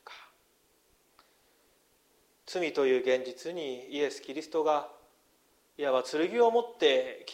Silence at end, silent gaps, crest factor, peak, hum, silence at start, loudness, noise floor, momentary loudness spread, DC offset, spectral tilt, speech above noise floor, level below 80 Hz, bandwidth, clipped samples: 0 s; none; 20 dB; -12 dBFS; 50 Hz at -80 dBFS; 0.1 s; -30 LUFS; -69 dBFS; 13 LU; under 0.1%; -3.5 dB/octave; 39 dB; -80 dBFS; 15 kHz; under 0.1%